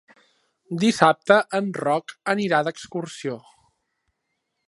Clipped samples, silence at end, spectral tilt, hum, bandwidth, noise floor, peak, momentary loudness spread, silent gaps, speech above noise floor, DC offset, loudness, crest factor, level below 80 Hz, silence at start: under 0.1%; 1.3 s; -5 dB/octave; none; 11.5 kHz; -77 dBFS; 0 dBFS; 14 LU; none; 55 dB; under 0.1%; -22 LUFS; 24 dB; -68 dBFS; 0.7 s